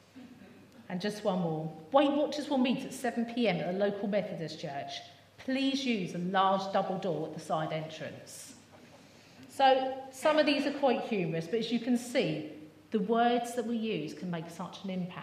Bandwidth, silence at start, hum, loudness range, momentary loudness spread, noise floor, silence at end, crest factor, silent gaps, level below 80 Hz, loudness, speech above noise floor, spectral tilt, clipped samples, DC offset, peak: 15 kHz; 0.15 s; none; 4 LU; 15 LU; -56 dBFS; 0 s; 20 dB; none; -80 dBFS; -32 LUFS; 25 dB; -5.5 dB/octave; under 0.1%; under 0.1%; -12 dBFS